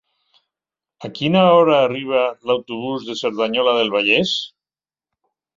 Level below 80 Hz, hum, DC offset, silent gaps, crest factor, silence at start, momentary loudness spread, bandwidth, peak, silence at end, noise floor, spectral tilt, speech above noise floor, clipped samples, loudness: -62 dBFS; none; under 0.1%; none; 18 dB; 1 s; 13 LU; 7.6 kHz; -2 dBFS; 1.1 s; under -90 dBFS; -5.5 dB/octave; over 73 dB; under 0.1%; -17 LUFS